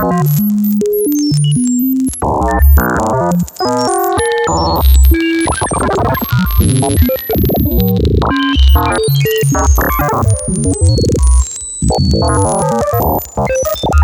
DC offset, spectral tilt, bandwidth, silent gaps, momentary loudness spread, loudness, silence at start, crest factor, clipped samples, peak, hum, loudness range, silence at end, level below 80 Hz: under 0.1%; -5.5 dB/octave; 17.5 kHz; none; 5 LU; -12 LUFS; 0 s; 12 dB; under 0.1%; 0 dBFS; none; 1 LU; 0 s; -16 dBFS